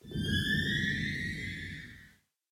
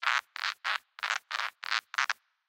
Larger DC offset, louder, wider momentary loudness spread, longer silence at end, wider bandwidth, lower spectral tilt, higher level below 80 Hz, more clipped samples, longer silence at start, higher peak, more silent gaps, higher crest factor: neither; about the same, -32 LUFS vs -32 LUFS; first, 14 LU vs 5 LU; about the same, 0.45 s vs 0.35 s; about the same, 16.5 kHz vs 17 kHz; first, -4.5 dB/octave vs 5 dB/octave; first, -50 dBFS vs under -90 dBFS; neither; about the same, 0.05 s vs 0 s; second, -18 dBFS vs -10 dBFS; neither; second, 16 dB vs 24 dB